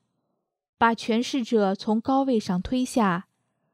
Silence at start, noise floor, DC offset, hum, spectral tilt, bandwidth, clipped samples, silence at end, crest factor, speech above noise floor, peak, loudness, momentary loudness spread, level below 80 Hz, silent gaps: 0.8 s; -78 dBFS; under 0.1%; none; -5.5 dB/octave; 14 kHz; under 0.1%; 0.5 s; 18 dB; 54 dB; -8 dBFS; -24 LUFS; 3 LU; -54 dBFS; none